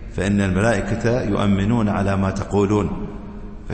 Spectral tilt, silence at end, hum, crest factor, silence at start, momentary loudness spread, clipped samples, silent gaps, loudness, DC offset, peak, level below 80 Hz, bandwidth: -7 dB/octave; 0 s; none; 14 dB; 0 s; 14 LU; under 0.1%; none; -20 LUFS; under 0.1%; -6 dBFS; -34 dBFS; 8.8 kHz